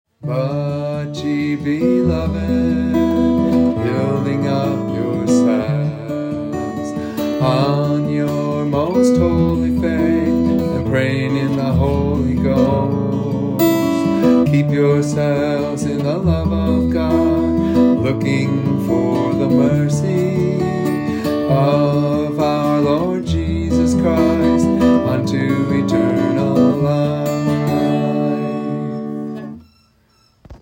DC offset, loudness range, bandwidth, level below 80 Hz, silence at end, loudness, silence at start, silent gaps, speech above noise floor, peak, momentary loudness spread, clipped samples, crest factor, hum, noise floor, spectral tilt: under 0.1%; 3 LU; 16.5 kHz; -38 dBFS; 0.05 s; -17 LUFS; 0.2 s; none; 40 dB; -2 dBFS; 7 LU; under 0.1%; 14 dB; none; -56 dBFS; -7.5 dB/octave